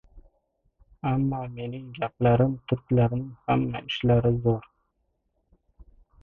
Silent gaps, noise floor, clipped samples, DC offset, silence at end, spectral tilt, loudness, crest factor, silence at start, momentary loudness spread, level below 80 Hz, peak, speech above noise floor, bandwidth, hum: none; -74 dBFS; under 0.1%; under 0.1%; 1.6 s; -9.5 dB/octave; -26 LUFS; 18 dB; 0.15 s; 11 LU; -48 dBFS; -10 dBFS; 49 dB; 4 kHz; none